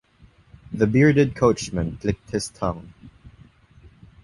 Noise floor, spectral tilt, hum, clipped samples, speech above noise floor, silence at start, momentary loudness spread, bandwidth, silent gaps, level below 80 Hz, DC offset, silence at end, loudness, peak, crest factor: -54 dBFS; -6.5 dB/octave; none; under 0.1%; 33 dB; 0.7 s; 12 LU; 11.5 kHz; none; -44 dBFS; under 0.1%; 1.15 s; -22 LUFS; -4 dBFS; 20 dB